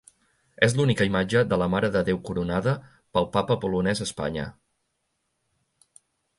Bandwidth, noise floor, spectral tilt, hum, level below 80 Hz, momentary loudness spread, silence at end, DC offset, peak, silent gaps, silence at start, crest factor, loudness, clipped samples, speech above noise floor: 11.5 kHz; -76 dBFS; -6 dB/octave; none; -50 dBFS; 8 LU; 1.9 s; under 0.1%; -2 dBFS; none; 0.6 s; 24 dB; -25 LUFS; under 0.1%; 52 dB